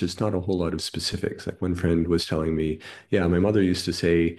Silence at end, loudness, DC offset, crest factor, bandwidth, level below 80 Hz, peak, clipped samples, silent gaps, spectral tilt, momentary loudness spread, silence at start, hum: 0 s; -25 LUFS; under 0.1%; 16 dB; 12.5 kHz; -44 dBFS; -8 dBFS; under 0.1%; none; -6 dB/octave; 8 LU; 0 s; none